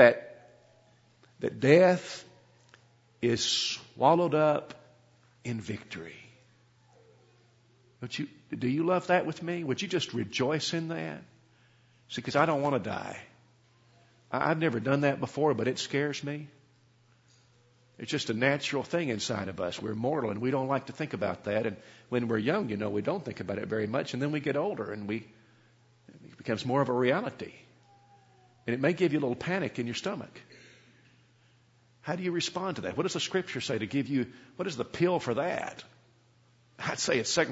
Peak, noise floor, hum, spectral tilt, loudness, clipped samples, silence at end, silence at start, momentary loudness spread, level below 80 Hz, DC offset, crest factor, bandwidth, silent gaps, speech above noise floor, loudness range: -6 dBFS; -64 dBFS; none; -5 dB/octave; -30 LUFS; under 0.1%; 0 s; 0 s; 14 LU; -70 dBFS; under 0.1%; 26 dB; 8 kHz; none; 34 dB; 5 LU